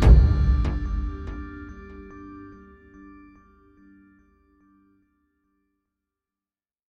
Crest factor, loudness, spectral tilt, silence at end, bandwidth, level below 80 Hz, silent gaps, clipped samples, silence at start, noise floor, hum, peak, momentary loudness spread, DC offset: 22 dB; -23 LUFS; -8.5 dB/octave; 4.45 s; 6 kHz; -26 dBFS; none; under 0.1%; 0 s; under -90 dBFS; none; -4 dBFS; 28 LU; under 0.1%